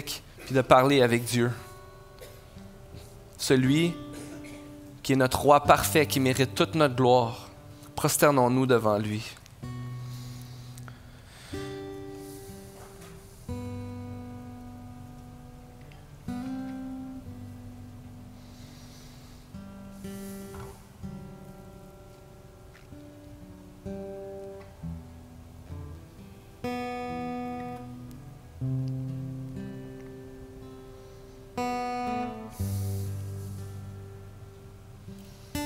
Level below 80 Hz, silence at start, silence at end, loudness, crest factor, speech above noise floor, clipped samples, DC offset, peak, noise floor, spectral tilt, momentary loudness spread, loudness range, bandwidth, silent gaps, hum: -54 dBFS; 0 s; 0 s; -27 LUFS; 28 dB; 27 dB; under 0.1%; under 0.1%; -4 dBFS; -50 dBFS; -5 dB/octave; 25 LU; 20 LU; 16 kHz; none; none